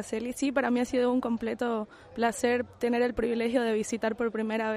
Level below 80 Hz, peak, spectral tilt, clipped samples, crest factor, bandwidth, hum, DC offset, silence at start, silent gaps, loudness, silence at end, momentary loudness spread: -58 dBFS; -12 dBFS; -4.5 dB/octave; under 0.1%; 16 dB; 15 kHz; none; under 0.1%; 0 s; none; -29 LUFS; 0 s; 5 LU